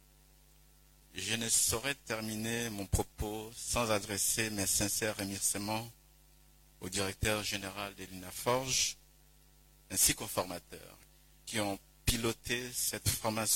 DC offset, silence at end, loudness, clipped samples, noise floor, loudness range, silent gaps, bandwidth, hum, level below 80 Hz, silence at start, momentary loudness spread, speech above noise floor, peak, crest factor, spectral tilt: under 0.1%; 0 s; -33 LUFS; under 0.1%; -63 dBFS; 3 LU; none; 16.5 kHz; none; -52 dBFS; 1.15 s; 14 LU; 28 dB; -14 dBFS; 22 dB; -2.5 dB/octave